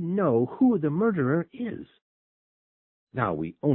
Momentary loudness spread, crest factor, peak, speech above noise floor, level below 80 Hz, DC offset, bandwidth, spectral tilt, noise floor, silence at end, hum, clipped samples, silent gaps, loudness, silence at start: 12 LU; 18 dB; -10 dBFS; over 65 dB; -62 dBFS; under 0.1%; 3.8 kHz; -13 dB/octave; under -90 dBFS; 0 s; none; under 0.1%; 2.02-3.07 s; -26 LUFS; 0 s